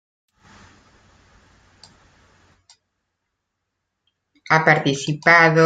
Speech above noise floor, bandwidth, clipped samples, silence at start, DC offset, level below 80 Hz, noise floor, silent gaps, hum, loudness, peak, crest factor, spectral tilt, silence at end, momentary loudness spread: 63 dB; 9.2 kHz; under 0.1%; 4.5 s; under 0.1%; -64 dBFS; -78 dBFS; none; none; -16 LUFS; -2 dBFS; 20 dB; -5 dB/octave; 0 s; 7 LU